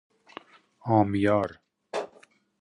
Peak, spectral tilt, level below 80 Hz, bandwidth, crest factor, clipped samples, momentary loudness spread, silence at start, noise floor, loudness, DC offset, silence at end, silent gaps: -10 dBFS; -8 dB/octave; -58 dBFS; 10.5 kHz; 20 dB; under 0.1%; 24 LU; 0.85 s; -59 dBFS; -26 LUFS; under 0.1%; 0.55 s; none